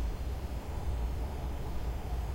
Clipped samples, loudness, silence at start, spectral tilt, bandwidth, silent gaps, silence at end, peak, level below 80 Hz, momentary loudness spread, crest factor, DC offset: under 0.1%; -39 LUFS; 0 s; -6.5 dB/octave; 16 kHz; none; 0 s; -24 dBFS; -36 dBFS; 3 LU; 12 dB; under 0.1%